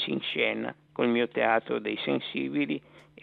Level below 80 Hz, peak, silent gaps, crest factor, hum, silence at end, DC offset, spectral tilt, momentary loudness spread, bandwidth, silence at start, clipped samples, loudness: -74 dBFS; -10 dBFS; none; 20 dB; none; 0.2 s; under 0.1%; -7.5 dB/octave; 7 LU; 4.7 kHz; 0 s; under 0.1%; -29 LUFS